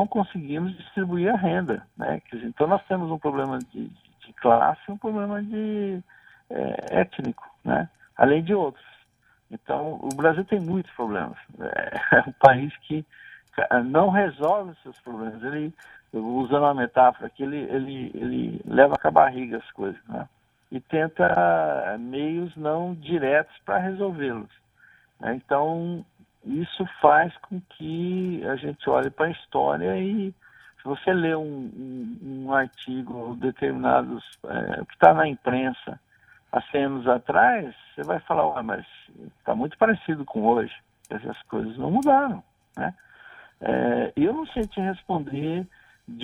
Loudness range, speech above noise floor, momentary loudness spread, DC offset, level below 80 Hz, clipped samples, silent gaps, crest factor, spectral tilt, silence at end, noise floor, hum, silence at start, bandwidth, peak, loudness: 5 LU; 39 dB; 16 LU; under 0.1%; -58 dBFS; under 0.1%; none; 24 dB; -7.5 dB/octave; 0 s; -63 dBFS; none; 0 s; 12 kHz; 0 dBFS; -24 LUFS